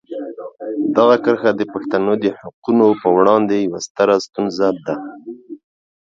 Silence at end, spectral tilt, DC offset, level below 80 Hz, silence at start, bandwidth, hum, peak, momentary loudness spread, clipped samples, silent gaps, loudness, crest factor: 0.45 s; -6 dB/octave; under 0.1%; -62 dBFS; 0.1 s; 7.6 kHz; none; 0 dBFS; 17 LU; under 0.1%; 2.54-2.62 s, 3.90-3.95 s; -16 LUFS; 16 dB